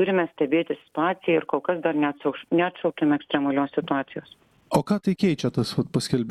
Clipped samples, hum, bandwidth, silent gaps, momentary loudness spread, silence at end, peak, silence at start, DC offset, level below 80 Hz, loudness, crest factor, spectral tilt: under 0.1%; none; 13 kHz; none; 4 LU; 0 s; -8 dBFS; 0 s; under 0.1%; -58 dBFS; -25 LUFS; 16 dB; -6.5 dB/octave